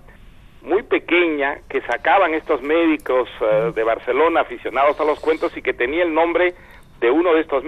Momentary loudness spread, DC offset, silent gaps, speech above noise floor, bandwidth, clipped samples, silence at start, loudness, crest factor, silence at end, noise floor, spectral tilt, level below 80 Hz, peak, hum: 6 LU; under 0.1%; none; 25 dB; 10.5 kHz; under 0.1%; 0.1 s; -19 LUFS; 14 dB; 0 s; -43 dBFS; -6 dB/octave; -48 dBFS; -4 dBFS; none